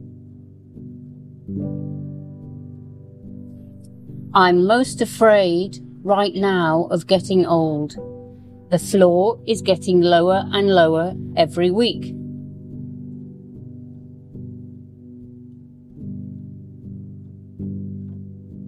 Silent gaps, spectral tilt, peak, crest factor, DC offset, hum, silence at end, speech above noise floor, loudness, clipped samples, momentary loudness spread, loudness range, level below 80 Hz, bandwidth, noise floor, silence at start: none; -6 dB/octave; -2 dBFS; 20 dB; under 0.1%; none; 0 s; 25 dB; -18 LUFS; under 0.1%; 25 LU; 20 LU; -56 dBFS; 14 kHz; -42 dBFS; 0 s